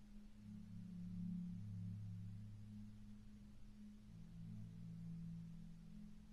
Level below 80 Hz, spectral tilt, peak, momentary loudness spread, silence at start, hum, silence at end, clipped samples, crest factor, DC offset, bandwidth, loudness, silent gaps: -64 dBFS; -8.5 dB/octave; -40 dBFS; 11 LU; 0 s; none; 0 s; under 0.1%; 14 dB; under 0.1%; 12 kHz; -55 LUFS; none